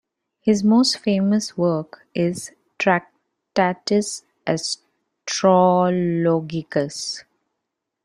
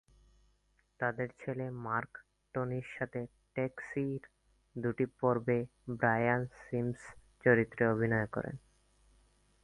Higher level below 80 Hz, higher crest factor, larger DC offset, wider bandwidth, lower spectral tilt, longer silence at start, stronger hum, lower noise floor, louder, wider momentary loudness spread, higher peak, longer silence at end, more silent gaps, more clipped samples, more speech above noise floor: about the same, -64 dBFS vs -64 dBFS; second, 18 dB vs 24 dB; neither; first, 13 kHz vs 11 kHz; second, -5 dB/octave vs -9 dB/octave; second, 0.45 s vs 1 s; second, none vs 50 Hz at -70 dBFS; first, -80 dBFS vs -73 dBFS; first, -21 LUFS vs -35 LUFS; about the same, 13 LU vs 15 LU; first, -2 dBFS vs -12 dBFS; second, 0.85 s vs 1.05 s; neither; neither; first, 61 dB vs 39 dB